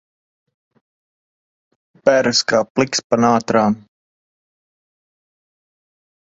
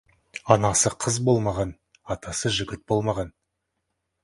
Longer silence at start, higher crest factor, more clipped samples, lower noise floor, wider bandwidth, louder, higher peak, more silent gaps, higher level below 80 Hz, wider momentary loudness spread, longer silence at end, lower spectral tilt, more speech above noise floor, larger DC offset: first, 2.05 s vs 0.35 s; about the same, 20 dB vs 24 dB; neither; first, under -90 dBFS vs -79 dBFS; second, 7.8 kHz vs 11.5 kHz; first, -16 LUFS vs -24 LUFS; about the same, 0 dBFS vs 0 dBFS; first, 2.70-2.75 s, 3.04-3.10 s vs none; second, -60 dBFS vs -48 dBFS; second, 5 LU vs 14 LU; first, 2.5 s vs 0.95 s; about the same, -4 dB/octave vs -4 dB/octave; first, over 74 dB vs 55 dB; neither